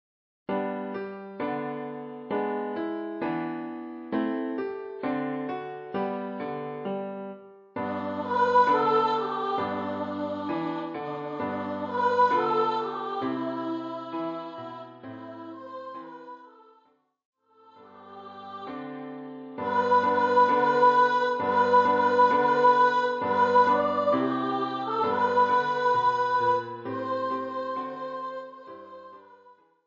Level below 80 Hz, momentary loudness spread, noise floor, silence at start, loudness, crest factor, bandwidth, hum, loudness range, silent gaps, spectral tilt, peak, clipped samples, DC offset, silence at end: -68 dBFS; 20 LU; -65 dBFS; 0.5 s; -26 LUFS; 18 dB; 7.4 kHz; none; 17 LU; 17.25-17.33 s; -6.5 dB/octave; -8 dBFS; under 0.1%; under 0.1%; 0.35 s